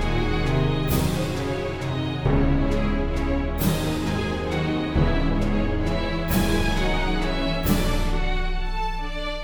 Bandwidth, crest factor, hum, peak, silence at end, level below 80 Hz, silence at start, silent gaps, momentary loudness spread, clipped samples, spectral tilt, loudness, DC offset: over 20 kHz; 16 dB; none; -6 dBFS; 0 s; -26 dBFS; 0 s; none; 5 LU; under 0.1%; -6 dB/octave; -24 LUFS; under 0.1%